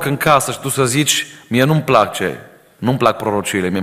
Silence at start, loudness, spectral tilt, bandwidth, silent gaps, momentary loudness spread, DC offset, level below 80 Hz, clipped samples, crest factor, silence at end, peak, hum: 0 s; -16 LUFS; -4 dB/octave; 16 kHz; none; 8 LU; under 0.1%; -50 dBFS; under 0.1%; 16 dB; 0 s; 0 dBFS; none